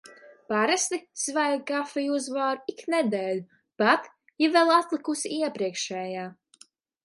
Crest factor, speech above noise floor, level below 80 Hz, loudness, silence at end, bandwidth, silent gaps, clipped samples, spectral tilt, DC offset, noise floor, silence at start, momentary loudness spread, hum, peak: 20 dB; 32 dB; -80 dBFS; -26 LUFS; 0.7 s; 11.5 kHz; none; under 0.1%; -3 dB/octave; under 0.1%; -58 dBFS; 0.1 s; 10 LU; none; -6 dBFS